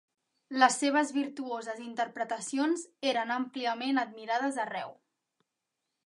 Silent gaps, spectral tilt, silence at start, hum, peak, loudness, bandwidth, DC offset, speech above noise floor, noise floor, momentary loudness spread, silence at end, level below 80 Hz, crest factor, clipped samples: none; -2 dB/octave; 0.5 s; none; -8 dBFS; -31 LUFS; 11.5 kHz; under 0.1%; 55 dB; -86 dBFS; 12 LU; 1.15 s; -88 dBFS; 24 dB; under 0.1%